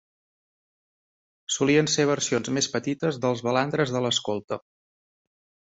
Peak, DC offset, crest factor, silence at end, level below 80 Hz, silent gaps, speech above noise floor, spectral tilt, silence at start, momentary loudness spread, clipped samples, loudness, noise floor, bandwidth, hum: -8 dBFS; under 0.1%; 20 dB; 1.1 s; -66 dBFS; 4.44-4.48 s; over 65 dB; -4 dB/octave; 1.5 s; 10 LU; under 0.1%; -24 LUFS; under -90 dBFS; 8.2 kHz; none